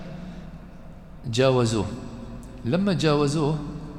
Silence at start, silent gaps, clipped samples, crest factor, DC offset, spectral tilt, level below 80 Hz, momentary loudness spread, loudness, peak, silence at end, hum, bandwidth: 0 s; none; under 0.1%; 18 dB; under 0.1%; -6 dB/octave; -44 dBFS; 22 LU; -24 LUFS; -8 dBFS; 0 s; none; 12.5 kHz